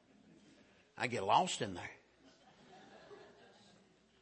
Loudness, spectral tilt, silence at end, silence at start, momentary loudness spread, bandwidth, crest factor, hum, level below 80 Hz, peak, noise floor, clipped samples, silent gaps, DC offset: -37 LUFS; -3.5 dB/octave; 0.95 s; 0.95 s; 28 LU; 8.4 kHz; 24 dB; none; -80 dBFS; -18 dBFS; -68 dBFS; under 0.1%; none; under 0.1%